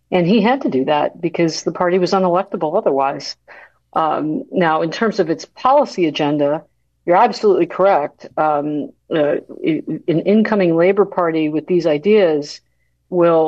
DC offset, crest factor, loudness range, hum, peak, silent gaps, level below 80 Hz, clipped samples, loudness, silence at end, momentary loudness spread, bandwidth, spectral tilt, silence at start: under 0.1%; 14 dB; 3 LU; none; -2 dBFS; none; -62 dBFS; under 0.1%; -17 LUFS; 0 s; 9 LU; 8 kHz; -6.5 dB/octave; 0.1 s